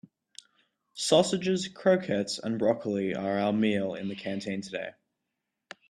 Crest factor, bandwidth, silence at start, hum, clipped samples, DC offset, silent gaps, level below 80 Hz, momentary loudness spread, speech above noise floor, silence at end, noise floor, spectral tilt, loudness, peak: 20 dB; 13 kHz; 0.95 s; none; under 0.1%; under 0.1%; none; -70 dBFS; 11 LU; 56 dB; 1 s; -84 dBFS; -5 dB/octave; -28 LUFS; -8 dBFS